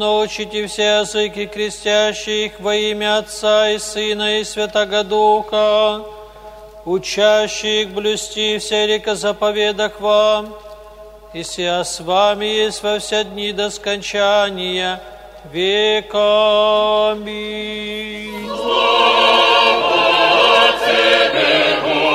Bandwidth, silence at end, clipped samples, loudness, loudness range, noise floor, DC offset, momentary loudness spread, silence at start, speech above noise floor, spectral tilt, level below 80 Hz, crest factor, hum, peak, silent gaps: 15.5 kHz; 0 s; under 0.1%; -15 LUFS; 6 LU; -38 dBFS; under 0.1%; 12 LU; 0 s; 21 dB; -2.5 dB/octave; -48 dBFS; 16 dB; none; 0 dBFS; none